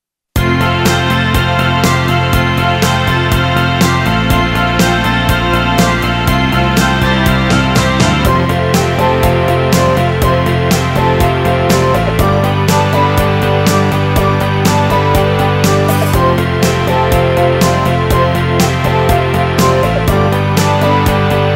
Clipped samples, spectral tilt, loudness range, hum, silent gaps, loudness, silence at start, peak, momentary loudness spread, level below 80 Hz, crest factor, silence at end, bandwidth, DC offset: under 0.1%; -5.5 dB/octave; 0 LU; none; none; -11 LUFS; 0.35 s; 0 dBFS; 1 LU; -24 dBFS; 10 dB; 0 s; 16.5 kHz; under 0.1%